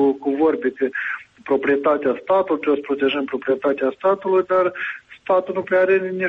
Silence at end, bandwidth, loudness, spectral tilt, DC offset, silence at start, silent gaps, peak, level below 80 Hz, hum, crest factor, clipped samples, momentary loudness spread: 0 s; 4.6 kHz; -20 LUFS; -7.5 dB/octave; under 0.1%; 0 s; none; -8 dBFS; -64 dBFS; none; 12 dB; under 0.1%; 6 LU